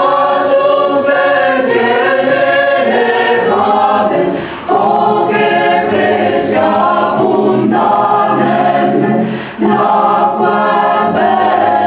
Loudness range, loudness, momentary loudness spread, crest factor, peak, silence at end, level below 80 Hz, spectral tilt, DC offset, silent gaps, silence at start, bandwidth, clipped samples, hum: 1 LU; -11 LUFS; 2 LU; 10 dB; 0 dBFS; 0 s; -52 dBFS; -9.5 dB/octave; under 0.1%; none; 0 s; 4 kHz; under 0.1%; none